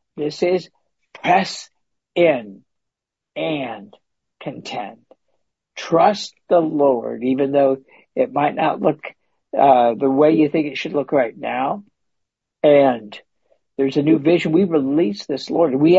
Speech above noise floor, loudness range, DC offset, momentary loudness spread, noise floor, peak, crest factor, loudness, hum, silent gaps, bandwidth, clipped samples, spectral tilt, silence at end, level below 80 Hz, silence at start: 65 dB; 7 LU; under 0.1%; 16 LU; -83 dBFS; -2 dBFS; 18 dB; -18 LUFS; none; none; 8 kHz; under 0.1%; -6.5 dB/octave; 0 s; -66 dBFS; 0.15 s